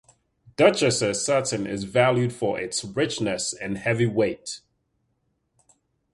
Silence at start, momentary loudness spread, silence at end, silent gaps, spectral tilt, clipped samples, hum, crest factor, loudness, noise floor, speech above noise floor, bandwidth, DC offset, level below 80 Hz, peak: 0.6 s; 9 LU; 1.55 s; none; -4.5 dB/octave; under 0.1%; none; 22 dB; -23 LUFS; -73 dBFS; 49 dB; 11.5 kHz; under 0.1%; -58 dBFS; -2 dBFS